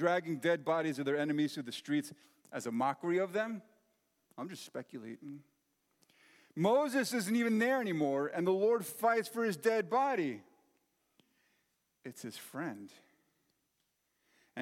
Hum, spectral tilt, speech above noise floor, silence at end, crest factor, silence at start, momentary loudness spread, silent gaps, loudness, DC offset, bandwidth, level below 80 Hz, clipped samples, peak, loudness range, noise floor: none; -5 dB/octave; 47 dB; 0 s; 18 dB; 0 s; 17 LU; none; -34 LUFS; under 0.1%; 16.5 kHz; under -90 dBFS; under 0.1%; -18 dBFS; 17 LU; -81 dBFS